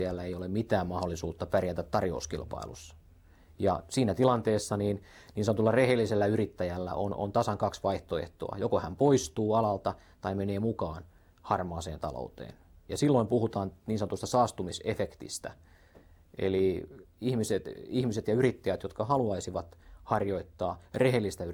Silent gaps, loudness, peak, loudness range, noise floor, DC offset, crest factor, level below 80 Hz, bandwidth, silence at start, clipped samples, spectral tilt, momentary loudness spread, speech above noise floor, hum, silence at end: none; -31 LUFS; -10 dBFS; 5 LU; -58 dBFS; under 0.1%; 20 dB; -54 dBFS; 18.5 kHz; 0 s; under 0.1%; -6 dB/octave; 13 LU; 27 dB; none; 0 s